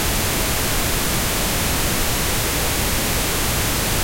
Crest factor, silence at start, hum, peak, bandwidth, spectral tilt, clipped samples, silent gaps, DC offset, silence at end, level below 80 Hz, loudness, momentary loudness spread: 16 dB; 0 s; none; -4 dBFS; 16.5 kHz; -2.5 dB/octave; under 0.1%; none; under 0.1%; 0 s; -28 dBFS; -19 LUFS; 0 LU